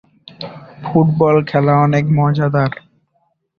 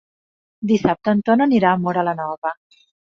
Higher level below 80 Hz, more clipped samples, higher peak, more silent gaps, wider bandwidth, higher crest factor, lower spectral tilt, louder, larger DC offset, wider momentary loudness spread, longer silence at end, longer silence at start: first, -50 dBFS vs -56 dBFS; neither; about the same, -2 dBFS vs -2 dBFS; second, none vs 2.38-2.42 s; about the same, 6.6 kHz vs 6.8 kHz; about the same, 14 dB vs 18 dB; first, -9 dB/octave vs -7.5 dB/octave; first, -14 LUFS vs -19 LUFS; neither; first, 19 LU vs 12 LU; first, 0.85 s vs 0.6 s; second, 0.4 s vs 0.6 s